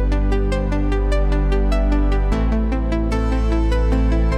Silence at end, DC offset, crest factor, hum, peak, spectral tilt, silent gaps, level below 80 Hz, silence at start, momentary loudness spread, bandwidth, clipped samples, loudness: 0 s; under 0.1%; 10 dB; none; -6 dBFS; -8 dB/octave; none; -18 dBFS; 0 s; 2 LU; 8.4 kHz; under 0.1%; -20 LUFS